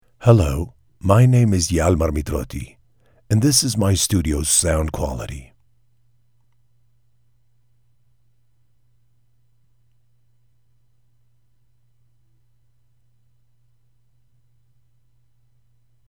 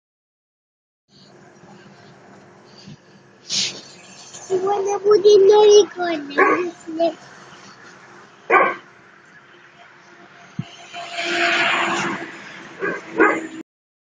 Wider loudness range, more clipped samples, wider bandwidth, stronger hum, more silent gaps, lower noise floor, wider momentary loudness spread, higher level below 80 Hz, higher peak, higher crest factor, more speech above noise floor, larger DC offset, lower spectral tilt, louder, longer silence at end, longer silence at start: about the same, 12 LU vs 12 LU; neither; first, 19.5 kHz vs 9.6 kHz; neither; neither; first, -65 dBFS vs -49 dBFS; second, 17 LU vs 24 LU; first, -36 dBFS vs -70 dBFS; about the same, 0 dBFS vs -2 dBFS; about the same, 22 dB vs 20 dB; first, 48 dB vs 34 dB; first, 0.1% vs under 0.1%; first, -5 dB/octave vs -3 dB/octave; about the same, -18 LUFS vs -17 LUFS; first, 10.65 s vs 0.55 s; second, 0.2 s vs 2.85 s